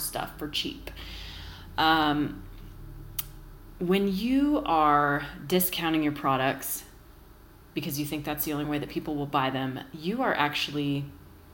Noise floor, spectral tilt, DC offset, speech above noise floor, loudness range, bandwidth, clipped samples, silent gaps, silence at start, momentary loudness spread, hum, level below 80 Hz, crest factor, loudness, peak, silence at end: -52 dBFS; -4.5 dB/octave; under 0.1%; 24 dB; 6 LU; 17 kHz; under 0.1%; none; 0 s; 17 LU; none; -50 dBFS; 22 dB; -28 LUFS; -8 dBFS; 0 s